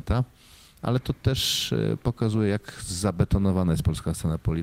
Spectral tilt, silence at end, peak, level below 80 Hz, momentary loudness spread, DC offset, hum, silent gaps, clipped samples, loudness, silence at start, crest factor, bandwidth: -5.5 dB/octave; 0 s; -10 dBFS; -38 dBFS; 5 LU; under 0.1%; none; none; under 0.1%; -26 LUFS; 0.05 s; 16 dB; 16 kHz